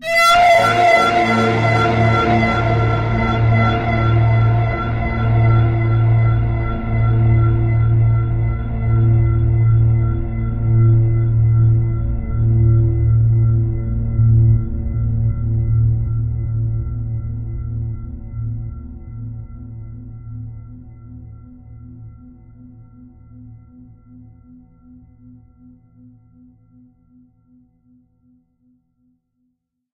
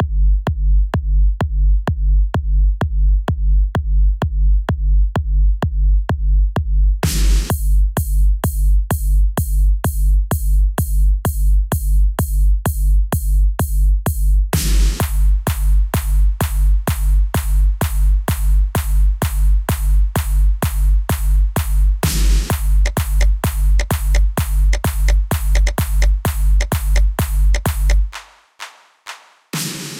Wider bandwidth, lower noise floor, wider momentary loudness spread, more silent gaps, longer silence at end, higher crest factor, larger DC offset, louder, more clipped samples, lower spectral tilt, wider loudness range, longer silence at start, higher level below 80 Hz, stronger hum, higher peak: second, 9.4 kHz vs 16.5 kHz; first, -70 dBFS vs -38 dBFS; first, 18 LU vs 1 LU; neither; first, 6.35 s vs 0 s; about the same, 14 dB vs 12 dB; neither; about the same, -16 LUFS vs -18 LUFS; neither; first, -7 dB/octave vs -5.5 dB/octave; first, 16 LU vs 1 LU; about the same, 0 s vs 0 s; second, -26 dBFS vs -14 dBFS; neither; about the same, -2 dBFS vs -2 dBFS